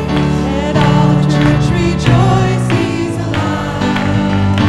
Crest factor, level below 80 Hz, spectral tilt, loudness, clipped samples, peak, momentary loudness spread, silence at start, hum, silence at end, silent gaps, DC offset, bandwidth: 12 dB; -28 dBFS; -7 dB/octave; -13 LUFS; under 0.1%; 0 dBFS; 6 LU; 0 s; none; 0 s; none; 1%; 12 kHz